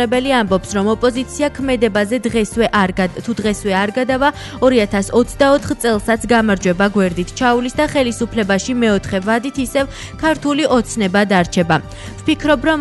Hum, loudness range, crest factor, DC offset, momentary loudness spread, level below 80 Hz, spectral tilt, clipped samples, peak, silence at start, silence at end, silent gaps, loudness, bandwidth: none; 2 LU; 12 dB; under 0.1%; 5 LU; -36 dBFS; -5 dB/octave; under 0.1%; -2 dBFS; 0 s; 0 s; none; -16 LUFS; 12 kHz